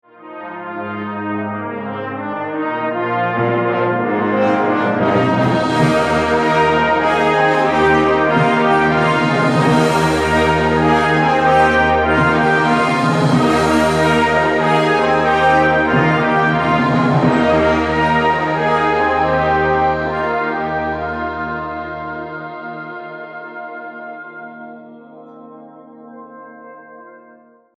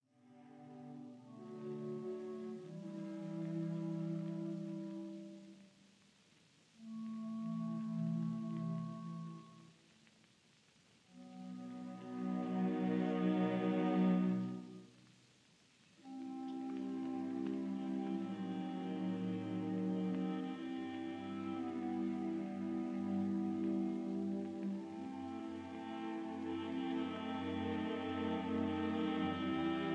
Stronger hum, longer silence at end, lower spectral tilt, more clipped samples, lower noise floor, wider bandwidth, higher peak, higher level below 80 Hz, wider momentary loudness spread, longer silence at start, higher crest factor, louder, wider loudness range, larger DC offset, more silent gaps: neither; first, 0.6 s vs 0 s; second, -6 dB/octave vs -8 dB/octave; neither; second, -47 dBFS vs -70 dBFS; first, 14 kHz vs 9.2 kHz; first, -2 dBFS vs -24 dBFS; first, -38 dBFS vs -80 dBFS; about the same, 15 LU vs 15 LU; about the same, 0.2 s vs 0.25 s; about the same, 14 dB vs 18 dB; first, -15 LUFS vs -41 LUFS; first, 15 LU vs 10 LU; neither; neither